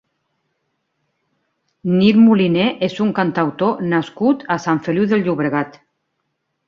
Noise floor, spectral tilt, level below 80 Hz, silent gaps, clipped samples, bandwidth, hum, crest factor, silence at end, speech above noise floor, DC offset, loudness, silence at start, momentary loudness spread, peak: -72 dBFS; -7.5 dB/octave; -60 dBFS; none; under 0.1%; 7 kHz; none; 16 dB; 0.95 s; 57 dB; under 0.1%; -17 LUFS; 1.85 s; 8 LU; -2 dBFS